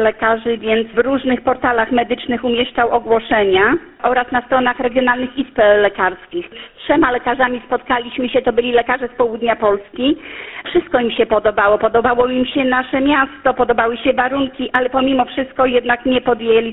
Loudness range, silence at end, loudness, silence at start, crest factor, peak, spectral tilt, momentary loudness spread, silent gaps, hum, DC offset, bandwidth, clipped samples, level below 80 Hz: 2 LU; 0 s; -16 LUFS; 0 s; 16 dB; 0 dBFS; -8 dB/octave; 5 LU; none; none; under 0.1%; 4.1 kHz; under 0.1%; -44 dBFS